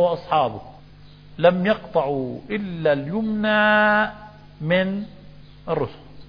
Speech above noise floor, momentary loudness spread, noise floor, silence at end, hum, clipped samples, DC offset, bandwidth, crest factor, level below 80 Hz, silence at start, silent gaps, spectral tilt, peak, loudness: 24 dB; 15 LU; -45 dBFS; 0 s; 50 Hz at -50 dBFS; under 0.1%; under 0.1%; 5.2 kHz; 18 dB; -52 dBFS; 0 s; none; -8.5 dB/octave; -4 dBFS; -21 LUFS